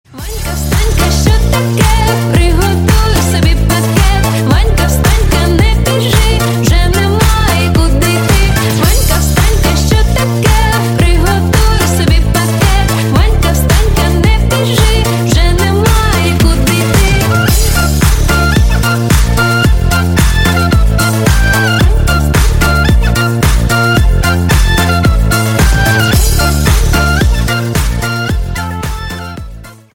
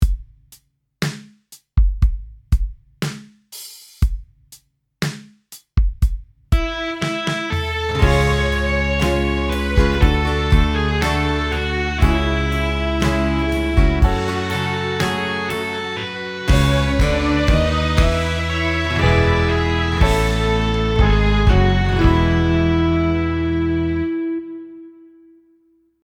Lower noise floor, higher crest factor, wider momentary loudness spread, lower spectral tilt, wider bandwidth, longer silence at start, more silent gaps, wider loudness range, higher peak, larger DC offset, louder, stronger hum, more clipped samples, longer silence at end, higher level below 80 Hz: second, -29 dBFS vs -58 dBFS; second, 8 dB vs 16 dB; second, 2 LU vs 10 LU; about the same, -5 dB/octave vs -6 dB/octave; about the same, 17 kHz vs 16.5 kHz; first, 0.15 s vs 0 s; neither; second, 0 LU vs 8 LU; about the same, 0 dBFS vs -2 dBFS; neither; first, -10 LUFS vs -19 LUFS; neither; neither; second, 0.2 s vs 1.15 s; first, -12 dBFS vs -22 dBFS